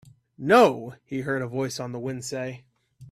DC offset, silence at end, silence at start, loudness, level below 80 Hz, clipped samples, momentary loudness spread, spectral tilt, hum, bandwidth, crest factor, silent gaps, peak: under 0.1%; 0.05 s; 0.4 s; -24 LUFS; -66 dBFS; under 0.1%; 18 LU; -5 dB/octave; none; 15 kHz; 22 dB; none; -4 dBFS